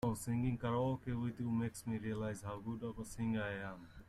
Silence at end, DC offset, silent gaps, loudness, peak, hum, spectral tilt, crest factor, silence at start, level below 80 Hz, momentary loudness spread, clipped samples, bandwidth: 0.05 s; under 0.1%; none; -41 LUFS; -26 dBFS; none; -7 dB/octave; 14 dB; 0 s; -60 dBFS; 8 LU; under 0.1%; 14 kHz